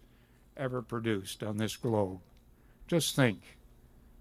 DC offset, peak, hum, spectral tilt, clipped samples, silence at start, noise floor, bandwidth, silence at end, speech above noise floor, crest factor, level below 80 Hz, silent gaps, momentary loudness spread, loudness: under 0.1%; -12 dBFS; none; -5 dB/octave; under 0.1%; 0.55 s; -61 dBFS; 16 kHz; 0.65 s; 29 dB; 22 dB; -60 dBFS; none; 12 LU; -33 LUFS